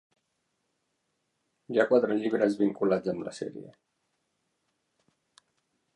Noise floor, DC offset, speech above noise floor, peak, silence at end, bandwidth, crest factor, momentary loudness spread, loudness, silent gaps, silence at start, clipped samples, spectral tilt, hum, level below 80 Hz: -79 dBFS; under 0.1%; 51 dB; -10 dBFS; 2.25 s; 10.5 kHz; 22 dB; 15 LU; -27 LUFS; none; 1.7 s; under 0.1%; -6.5 dB/octave; none; -76 dBFS